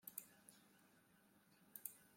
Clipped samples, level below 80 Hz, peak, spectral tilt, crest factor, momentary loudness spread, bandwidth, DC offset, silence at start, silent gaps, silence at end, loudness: under 0.1%; under -90 dBFS; -28 dBFS; -1.5 dB/octave; 34 dB; 13 LU; 16.5 kHz; under 0.1%; 0 s; none; 0 s; -57 LUFS